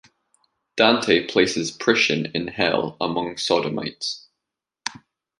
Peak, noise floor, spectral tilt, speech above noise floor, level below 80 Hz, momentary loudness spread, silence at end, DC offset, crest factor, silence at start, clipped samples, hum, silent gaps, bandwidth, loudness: -2 dBFS; -85 dBFS; -3.5 dB/octave; 63 dB; -60 dBFS; 15 LU; 0.45 s; under 0.1%; 22 dB; 0.75 s; under 0.1%; none; none; 11.5 kHz; -21 LUFS